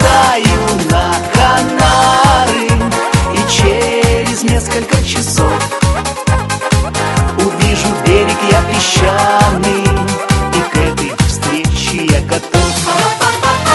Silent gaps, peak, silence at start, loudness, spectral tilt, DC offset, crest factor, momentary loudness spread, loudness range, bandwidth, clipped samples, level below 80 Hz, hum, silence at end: none; 0 dBFS; 0 s; -11 LUFS; -4.5 dB/octave; under 0.1%; 12 dB; 5 LU; 3 LU; 12 kHz; 0.1%; -22 dBFS; none; 0 s